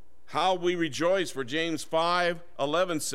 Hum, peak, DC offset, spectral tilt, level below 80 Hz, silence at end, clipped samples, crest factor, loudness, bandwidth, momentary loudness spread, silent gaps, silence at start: none; -12 dBFS; 1%; -3.5 dB/octave; -66 dBFS; 0 s; under 0.1%; 16 dB; -28 LUFS; 16 kHz; 4 LU; none; 0.3 s